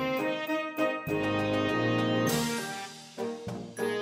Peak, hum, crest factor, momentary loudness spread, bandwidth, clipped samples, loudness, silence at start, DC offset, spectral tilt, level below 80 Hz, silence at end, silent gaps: -14 dBFS; none; 16 dB; 11 LU; 16 kHz; under 0.1%; -30 LUFS; 0 s; under 0.1%; -5 dB/octave; -62 dBFS; 0 s; none